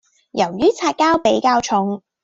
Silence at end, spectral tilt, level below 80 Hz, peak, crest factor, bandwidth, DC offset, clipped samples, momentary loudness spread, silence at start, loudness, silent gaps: 0.25 s; -4.5 dB/octave; -54 dBFS; -4 dBFS; 14 dB; 8 kHz; under 0.1%; under 0.1%; 7 LU; 0.35 s; -17 LUFS; none